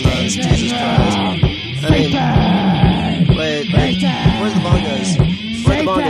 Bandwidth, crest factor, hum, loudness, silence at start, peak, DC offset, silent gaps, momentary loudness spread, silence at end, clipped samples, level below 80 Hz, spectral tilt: 12 kHz; 14 dB; none; -15 LUFS; 0 s; 0 dBFS; under 0.1%; none; 3 LU; 0 s; under 0.1%; -26 dBFS; -6 dB/octave